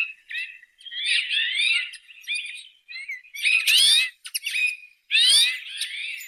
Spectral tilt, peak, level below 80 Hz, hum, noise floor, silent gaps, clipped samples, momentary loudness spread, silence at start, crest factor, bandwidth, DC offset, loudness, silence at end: 5.5 dB/octave; -8 dBFS; -76 dBFS; none; -42 dBFS; none; under 0.1%; 20 LU; 0 s; 16 dB; 17 kHz; under 0.1%; -20 LUFS; 0 s